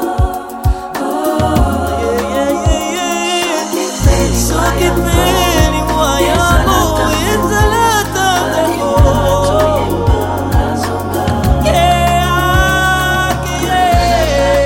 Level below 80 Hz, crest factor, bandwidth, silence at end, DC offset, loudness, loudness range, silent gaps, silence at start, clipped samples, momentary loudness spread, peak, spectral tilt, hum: -20 dBFS; 12 dB; 16.5 kHz; 0 s; under 0.1%; -13 LUFS; 2 LU; none; 0 s; under 0.1%; 5 LU; 0 dBFS; -4.5 dB/octave; none